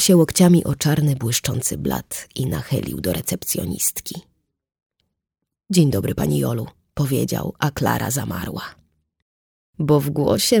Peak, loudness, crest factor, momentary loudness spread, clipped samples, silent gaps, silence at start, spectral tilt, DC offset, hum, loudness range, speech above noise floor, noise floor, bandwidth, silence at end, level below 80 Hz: -2 dBFS; -20 LUFS; 18 dB; 13 LU; under 0.1%; 4.86-4.90 s, 9.22-9.73 s; 0 s; -5 dB/octave; under 0.1%; none; 5 LU; 63 dB; -82 dBFS; over 20 kHz; 0 s; -46 dBFS